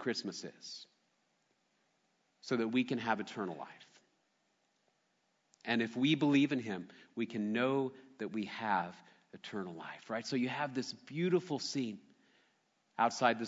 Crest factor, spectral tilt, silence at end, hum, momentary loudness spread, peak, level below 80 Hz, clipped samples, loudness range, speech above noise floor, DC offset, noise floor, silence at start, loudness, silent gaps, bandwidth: 22 dB; -4 dB/octave; 0 s; none; 17 LU; -14 dBFS; -86 dBFS; under 0.1%; 5 LU; 43 dB; under 0.1%; -78 dBFS; 0 s; -36 LUFS; none; 7.6 kHz